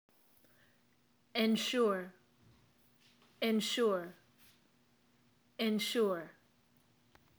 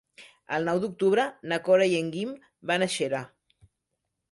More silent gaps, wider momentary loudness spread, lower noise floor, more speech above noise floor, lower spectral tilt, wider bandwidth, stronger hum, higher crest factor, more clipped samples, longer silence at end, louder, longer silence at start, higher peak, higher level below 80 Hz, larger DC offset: neither; first, 18 LU vs 12 LU; second, -73 dBFS vs -82 dBFS; second, 39 dB vs 56 dB; about the same, -4 dB/octave vs -4.5 dB/octave; first, over 20 kHz vs 11.5 kHz; neither; about the same, 20 dB vs 16 dB; neither; about the same, 1.05 s vs 1.05 s; second, -34 LUFS vs -26 LUFS; first, 1.35 s vs 0.2 s; second, -20 dBFS vs -12 dBFS; second, -86 dBFS vs -72 dBFS; neither